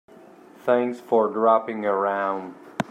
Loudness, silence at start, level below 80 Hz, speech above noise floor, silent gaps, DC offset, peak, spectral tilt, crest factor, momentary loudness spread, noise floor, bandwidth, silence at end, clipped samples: -23 LUFS; 0.65 s; -70 dBFS; 26 dB; none; under 0.1%; -4 dBFS; -6.5 dB/octave; 20 dB; 12 LU; -48 dBFS; 13 kHz; 0.05 s; under 0.1%